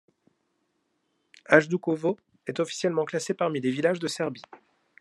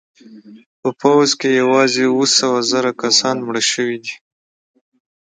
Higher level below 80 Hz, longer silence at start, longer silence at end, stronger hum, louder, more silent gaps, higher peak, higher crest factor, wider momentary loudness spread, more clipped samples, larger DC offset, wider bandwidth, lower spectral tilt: second, -76 dBFS vs -66 dBFS; first, 1.5 s vs 0.3 s; second, 0.45 s vs 1.05 s; neither; second, -26 LUFS vs -15 LUFS; second, none vs 0.66-0.83 s; about the same, -2 dBFS vs 0 dBFS; first, 26 dB vs 18 dB; about the same, 12 LU vs 11 LU; neither; neither; first, 12.5 kHz vs 9.6 kHz; first, -5 dB/octave vs -2.5 dB/octave